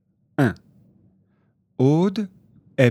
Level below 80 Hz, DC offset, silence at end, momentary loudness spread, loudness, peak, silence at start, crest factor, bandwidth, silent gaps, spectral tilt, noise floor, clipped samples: -62 dBFS; under 0.1%; 0 s; 18 LU; -22 LUFS; 0 dBFS; 0.4 s; 24 dB; 13.5 kHz; none; -8 dB/octave; -65 dBFS; under 0.1%